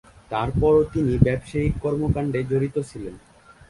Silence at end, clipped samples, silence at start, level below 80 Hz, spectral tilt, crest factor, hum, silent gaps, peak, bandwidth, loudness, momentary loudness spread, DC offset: 0.5 s; under 0.1%; 0.3 s; -36 dBFS; -8.5 dB/octave; 22 dB; none; none; -2 dBFS; 11.5 kHz; -22 LUFS; 11 LU; under 0.1%